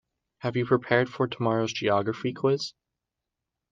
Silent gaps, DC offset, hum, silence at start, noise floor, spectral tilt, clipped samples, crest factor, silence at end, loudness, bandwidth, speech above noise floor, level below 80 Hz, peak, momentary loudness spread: none; under 0.1%; none; 0.45 s; -86 dBFS; -6 dB/octave; under 0.1%; 20 dB; 1 s; -27 LUFS; 7.6 kHz; 60 dB; -66 dBFS; -8 dBFS; 7 LU